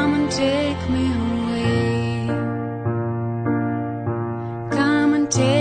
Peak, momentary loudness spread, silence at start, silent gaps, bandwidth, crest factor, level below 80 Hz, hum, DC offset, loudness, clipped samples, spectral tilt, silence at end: -6 dBFS; 8 LU; 0 s; none; 9.4 kHz; 16 dB; -44 dBFS; none; under 0.1%; -22 LUFS; under 0.1%; -5.5 dB/octave; 0 s